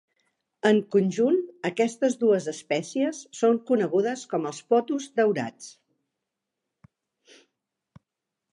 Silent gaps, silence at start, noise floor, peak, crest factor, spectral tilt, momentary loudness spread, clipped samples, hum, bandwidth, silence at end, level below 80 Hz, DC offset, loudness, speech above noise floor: none; 0.65 s; -85 dBFS; -6 dBFS; 20 dB; -5.5 dB/octave; 8 LU; under 0.1%; none; 11 kHz; 2.85 s; -80 dBFS; under 0.1%; -25 LUFS; 61 dB